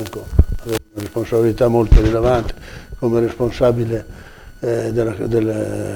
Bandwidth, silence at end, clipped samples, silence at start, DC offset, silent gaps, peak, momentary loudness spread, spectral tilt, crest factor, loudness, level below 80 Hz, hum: 18 kHz; 0 s; under 0.1%; 0 s; under 0.1%; none; 0 dBFS; 12 LU; -7.5 dB/octave; 16 dB; -18 LUFS; -22 dBFS; none